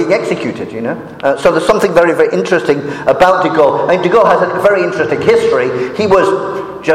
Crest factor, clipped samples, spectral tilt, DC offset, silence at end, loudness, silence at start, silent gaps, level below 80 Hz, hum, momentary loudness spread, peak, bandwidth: 12 dB; under 0.1%; -5.5 dB/octave; under 0.1%; 0 s; -12 LUFS; 0 s; none; -44 dBFS; none; 9 LU; 0 dBFS; 14.5 kHz